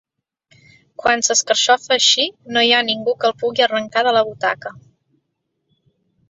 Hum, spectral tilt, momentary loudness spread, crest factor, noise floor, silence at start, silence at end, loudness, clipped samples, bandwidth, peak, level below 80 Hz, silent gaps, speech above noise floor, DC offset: none; -0.5 dB/octave; 9 LU; 18 dB; -73 dBFS; 1.05 s; 1.5 s; -16 LUFS; under 0.1%; 8.2 kHz; -2 dBFS; -62 dBFS; none; 56 dB; under 0.1%